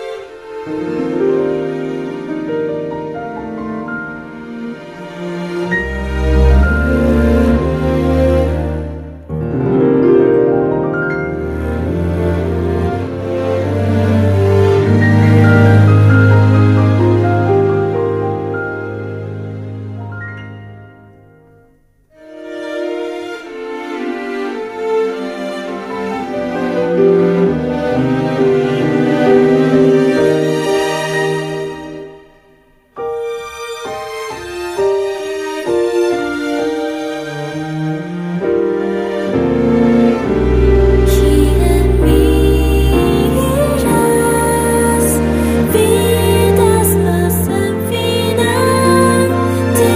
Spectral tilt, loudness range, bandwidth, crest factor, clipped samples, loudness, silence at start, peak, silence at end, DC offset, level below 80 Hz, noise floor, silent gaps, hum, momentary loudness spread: -6.5 dB/octave; 12 LU; 15.5 kHz; 14 dB; under 0.1%; -14 LUFS; 0 s; 0 dBFS; 0 s; under 0.1%; -24 dBFS; -51 dBFS; none; none; 14 LU